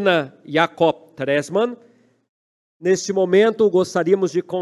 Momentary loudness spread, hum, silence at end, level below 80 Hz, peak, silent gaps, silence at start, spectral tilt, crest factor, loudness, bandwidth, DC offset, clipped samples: 7 LU; none; 0 s; -68 dBFS; -2 dBFS; 2.29-2.80 s; 0 s; -5 dB/octave; 18 dB; -19 LUFS; 12 kHz; under 0.1%; under 0.1%